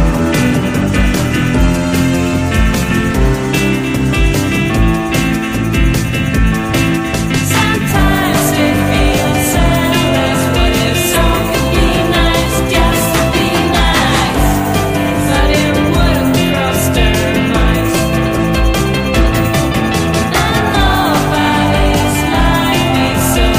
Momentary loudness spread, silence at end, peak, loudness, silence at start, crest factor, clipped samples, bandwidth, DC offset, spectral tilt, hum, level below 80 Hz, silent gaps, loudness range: 2 LU; 0 s; 0 dBFS; -12 LUFS; 0 s; 12 dB; under 0.1%; 16 kHz; under 0.1%; -5 dB/octave; none; -18 dBFS; none; 2 LU